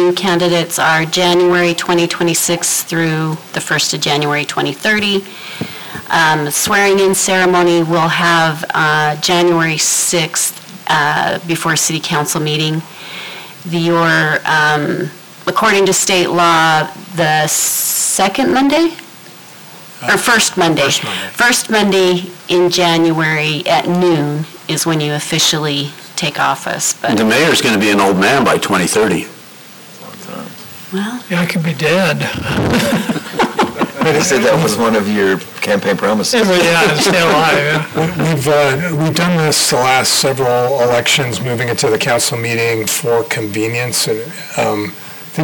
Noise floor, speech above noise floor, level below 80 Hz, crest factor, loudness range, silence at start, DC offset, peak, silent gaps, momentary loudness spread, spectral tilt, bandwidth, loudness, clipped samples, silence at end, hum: -36 dBFS; 23 dB; -48 dBFS; 10 dB; 4 LU; 0 s; under 0.1%; -4 dBFS; none; 10 LU; -3.5 dB/octave; over 20 kHz; -13 LUFS; under 0.1%; 0 s; none